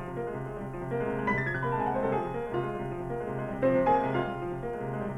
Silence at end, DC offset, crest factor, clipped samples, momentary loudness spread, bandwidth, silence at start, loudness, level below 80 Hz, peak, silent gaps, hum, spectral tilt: 0 s; under 0.1%; 16 dB; under 0.1%; 10 LU; 11.5 kHz; 0 s; -31 LUFS; -50 dBFS; -14 dBFS; none; none; -8.5 dB/octave